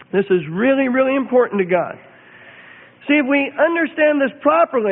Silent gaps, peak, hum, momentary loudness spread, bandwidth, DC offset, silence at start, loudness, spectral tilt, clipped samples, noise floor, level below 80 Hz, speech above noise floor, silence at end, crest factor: none; -2 dBFS; none; 4 LU; 3.9 kHz; under 0.1%; 0.15 s; -17 LUFS; -11 dB/octave; under 0.1%; -43 dBFS; -62 dBFS; 27 dB; 0 s; 16 dB